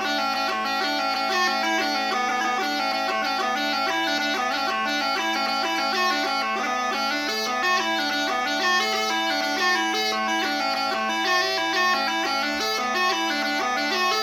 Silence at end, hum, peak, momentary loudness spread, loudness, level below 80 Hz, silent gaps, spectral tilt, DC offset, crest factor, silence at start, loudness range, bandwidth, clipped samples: 0 s; none; -8 dBFS; 3 LU; -23 LUFS; -72 dBFS; none; -1 dB/octave; under 0.1%; 16 dB; 0 s; 1 LU; 19 kHz; under 0.1%